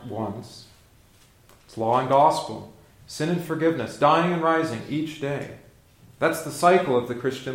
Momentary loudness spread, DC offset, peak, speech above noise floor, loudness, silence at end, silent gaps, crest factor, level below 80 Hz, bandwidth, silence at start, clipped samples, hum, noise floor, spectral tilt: 18 LU; under 0.1%; -6 dBFS; 32 dB; -23 LUFS; 0 s; none; 20 dB; -60 dBFS; 16.5 kHz; 0 s; under 0.1%; none; -55 dBFS; -5.5 dB/octave